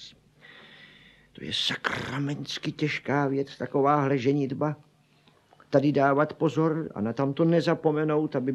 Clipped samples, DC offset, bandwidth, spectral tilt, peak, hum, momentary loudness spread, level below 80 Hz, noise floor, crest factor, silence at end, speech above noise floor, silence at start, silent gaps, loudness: under 0.1%; under 0.1%; 12 kHz; -6.5 dB/octave; -8 dBFS; none; 8 LU; -66 dBFS; -61 dBFS; 20 dB; 0 s; 36 dB; 0 s; none; -26 LUFS